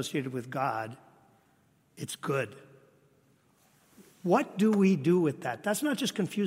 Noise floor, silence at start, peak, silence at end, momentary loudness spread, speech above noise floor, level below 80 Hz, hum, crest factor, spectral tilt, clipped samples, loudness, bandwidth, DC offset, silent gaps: -67 dBFS; 0 s; -12 dBFS; 0 s; 14 LU; 38 dB; -78 dBFS; none; 20 dB; -5.5 dB/octave; under 0.1%; -29 LUFS; 16 kHz; under 0.1%; none